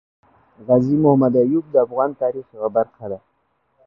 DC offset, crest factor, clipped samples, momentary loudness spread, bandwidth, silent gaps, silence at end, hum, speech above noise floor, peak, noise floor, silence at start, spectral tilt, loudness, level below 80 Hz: under 0.1%; 18 dB; under 0.1%; 17 LU; 5.8 kHz; none; 0.7 s; none; 49 dB; -2 dBFS; -67 dBFS; 0.65 s; -12 dB/octave; -18 LUFS; -58 dBFS